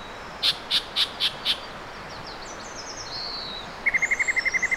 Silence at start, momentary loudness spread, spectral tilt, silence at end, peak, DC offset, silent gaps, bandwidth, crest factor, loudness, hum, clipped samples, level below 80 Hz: 0 s; 15 LU; -0.5 dB/octave; 0 s; -10 dBFS; under 0.1%; none; 16.5 kHz; 18 dB; -24 LUFS; none; under 0.1%; -50 dBFS